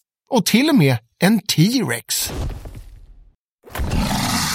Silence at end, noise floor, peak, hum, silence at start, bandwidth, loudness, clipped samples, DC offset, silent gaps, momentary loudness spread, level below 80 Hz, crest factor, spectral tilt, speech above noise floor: 0 s; -50 dBFS; 0 dBFS; none; 0.3 s; 16.5 kHz; -18 LUFS; under 0.1%; under 0.1%; 3.37-3.58 s; 15 LU; -34 dBFS; 18 dB; -4.5 dB/octave; 34 dB